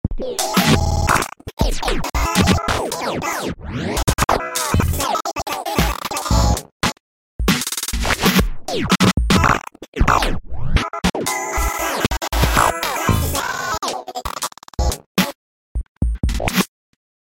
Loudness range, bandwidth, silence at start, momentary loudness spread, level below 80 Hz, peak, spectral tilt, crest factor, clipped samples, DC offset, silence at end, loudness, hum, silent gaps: 4 LU; 17 kHz; 0.05 s; 9 LU; -26 dBFS; -4 dBFS; -4 dB/octave; 16 dB; under 0.1%; under 0.1%; 0.6 s; -19 LUFS; none; 1.53-1.57 s, 6.72-6.80 s, 7.00-7.39 s, 9.88-9.92 s, 15.06-15.15 s, 15.35-15.75 s, 15.89-16.01 s